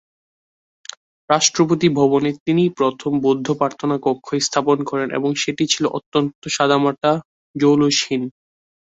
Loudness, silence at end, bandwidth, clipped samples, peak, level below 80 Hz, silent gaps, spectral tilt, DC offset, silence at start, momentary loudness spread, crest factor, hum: -18 LUFS; 0.6 s; 8 kHz; under 0.1%; -2 dBFS; -60 dBFS; 2.40-2.46 s, 6.06-6.12 s, 6.35-6.42 s, 7.25-7.54 s; -4.5 dB/octave; under 0.1%; 1.3 s; 8 LU; 18 dB; none